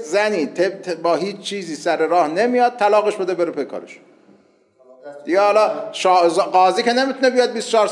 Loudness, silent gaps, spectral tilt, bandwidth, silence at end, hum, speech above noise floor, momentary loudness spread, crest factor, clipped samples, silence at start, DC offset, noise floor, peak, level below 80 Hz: -18 LUFS; none; -3.5 dB/octave; 11.5 kHz; 0 s; none; 37 dB; 10 LU; 14 dB; under 0.1%; 0 s; under 0.1%; -55 dBFS; -4 dBFS; -84 dBFS